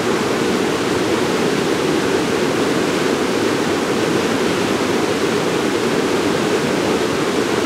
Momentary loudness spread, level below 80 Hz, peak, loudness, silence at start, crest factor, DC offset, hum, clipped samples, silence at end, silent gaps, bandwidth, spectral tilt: 1 LU; -50 dBFS; -4 dBFS; -17 LUFS; 0 s; 12 dB; under 0.1%; none; under 0.1%; 0 s; none; 16 kHz; -4.5 dB/octave